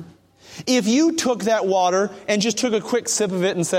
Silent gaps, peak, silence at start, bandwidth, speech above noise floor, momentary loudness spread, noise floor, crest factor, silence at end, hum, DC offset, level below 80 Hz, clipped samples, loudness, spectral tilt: none; -6 dBFS; 0 s; 16.5 kHz; 27 dB; 4 LU; -47 dBFS; 14 dB; 0 s; none; under 0.1%; -64 dBFS; under 0.1%; -20 LUFS; -3.5 dB/octave